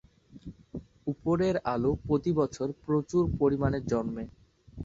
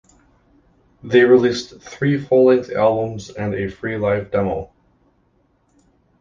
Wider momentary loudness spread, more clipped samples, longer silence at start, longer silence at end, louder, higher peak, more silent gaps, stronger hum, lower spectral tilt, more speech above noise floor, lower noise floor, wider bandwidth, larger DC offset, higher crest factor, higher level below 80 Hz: first, 18 LU vs 14 LU; neither; second, 0.35 s vs 1.05 s; second, 0 s vs 1.55 s; second, -29 LUFS vs -18 LUFS; second, -12 dBFS vs -2 dBFS; neither; neither; first, -8 dB/octave vs -6.5 dB/octave; second, 20 dB vs 44 dB; second, -48 dBFS vs -61 dBFS; about the same, 7.8 kHz vs 7.4 kHz; neither; about the same, 16 dB vs 18 dB; about the same, -48 dBFS vs -48 dBFS